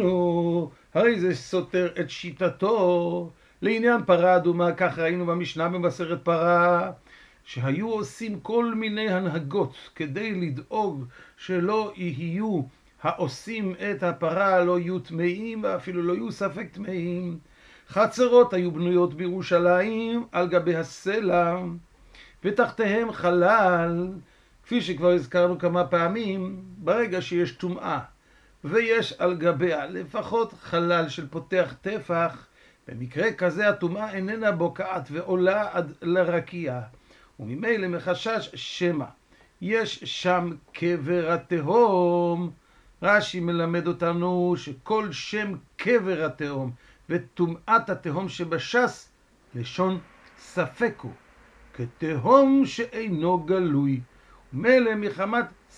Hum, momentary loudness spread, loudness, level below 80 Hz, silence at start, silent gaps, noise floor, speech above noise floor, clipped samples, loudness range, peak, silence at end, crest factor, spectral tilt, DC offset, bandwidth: none; 12 LU; -25 LUFS; -60 dBFS; 0 s; none; -58 dBFS; 33 dB; under 0.1%; 5 LU; -4 dBFS; 0.3 s; 22 dB; -6.5 dB/octave; under 0.1%; 10.5 kHz